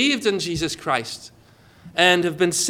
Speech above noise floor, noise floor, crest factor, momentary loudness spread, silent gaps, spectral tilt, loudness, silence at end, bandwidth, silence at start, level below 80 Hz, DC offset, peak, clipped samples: 30 dB; -51 dBFS; 20 dB; 13 LU; none; -3 dB/octave; -20 LUFS; 0 s; 17 kHz; 0 s; -52 dBFS; under 0.1%; -2 dBFS; under 0.1%